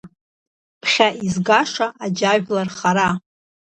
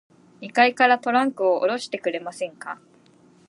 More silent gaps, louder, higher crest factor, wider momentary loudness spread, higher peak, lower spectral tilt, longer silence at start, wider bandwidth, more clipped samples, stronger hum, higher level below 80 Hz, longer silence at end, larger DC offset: first, 0.21-0.81 s vs none; first, -19 LUFS vs -22 LUFS; about the same, 20 dB vs 18 dB; second, 7 LU vs 19 LU; first, 0 dBFS vs -4 dBFS; about the same, -4 dB/octave vs -3.5 dB/octave; second, 0.05 s vs 0.4 s; second, 8.8 kHz vs 11.5 kHz; neither; neither; first, -58 dBFS vs -80 dBFS; second, 0.6 s vs 0.75 s; neither